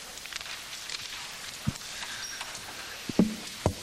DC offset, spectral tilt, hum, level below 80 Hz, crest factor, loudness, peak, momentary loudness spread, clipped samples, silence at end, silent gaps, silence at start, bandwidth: under 0.1%; -4 dB/octave; none; -52 dBFS; 24 dB; -34 LUFS; -10 dBFS; 10 LU; under 0.1%; 0 s; none; 0 s; 16 kHz